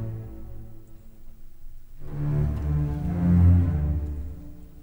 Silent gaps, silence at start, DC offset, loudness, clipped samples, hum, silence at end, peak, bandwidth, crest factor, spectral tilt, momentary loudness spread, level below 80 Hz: none; 0 s; under 0.1%; -24 LUFS; under 0.1%; none; 0 s; -10 dBFS; 3 kHz; 16 dB; -10.5 dB/octave; 25 LU; -32 dBFS